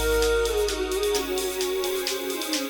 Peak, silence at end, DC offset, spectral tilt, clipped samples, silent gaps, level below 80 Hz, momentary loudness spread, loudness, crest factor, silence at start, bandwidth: -10 dBFS; 0 s; under 0.1%; -3 dB/octave; under 0.1%; none; -38 dBFS; 5 LU; -25 LUFS; 14 dB; 0 s; over 20 kHz